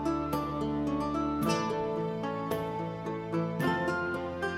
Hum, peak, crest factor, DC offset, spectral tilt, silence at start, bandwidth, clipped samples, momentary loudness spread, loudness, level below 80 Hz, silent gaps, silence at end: none; -16 dBFS; 16 dB; under 0.1%; -6.5 dB/octave; 0 s; 16 kHz; under 0.1%; 5 LU; -32 LUFS; -54 dBFS; none; 0 s